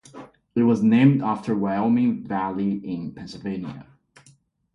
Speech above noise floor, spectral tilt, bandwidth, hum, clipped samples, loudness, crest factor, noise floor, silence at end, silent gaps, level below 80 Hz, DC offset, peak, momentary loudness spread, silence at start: 36 dB; -8.5 dB/octave; 7.4 kHz; none; under 0.1%; -22 LUFS; 18 dB; -58 dBFS; 0.9 s; none; -60 dBFS; under 0.1%; -6 dBFS; 16 LU; 0.15 s